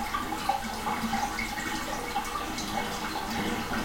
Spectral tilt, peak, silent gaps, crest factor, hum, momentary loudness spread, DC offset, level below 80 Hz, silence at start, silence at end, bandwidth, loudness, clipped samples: -3 dB/octave; -14 dBFS; none; 18 dB; none; 2 LU; under 0.1%; -46 dBFS; 0 s; 0 s; 16.5 kHz; -31 LUFS; under 0.1%